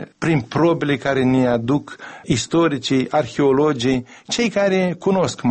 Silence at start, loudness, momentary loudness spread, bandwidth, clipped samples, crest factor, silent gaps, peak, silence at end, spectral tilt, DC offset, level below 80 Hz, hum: 0 s; -19 LUFS; 6 LU; 8.8 kHz; under 0.1%; 12 dB; none; -6 dBFS; 0 s; -5.5 dB/octave; under 0.1%; -50 dBFS; none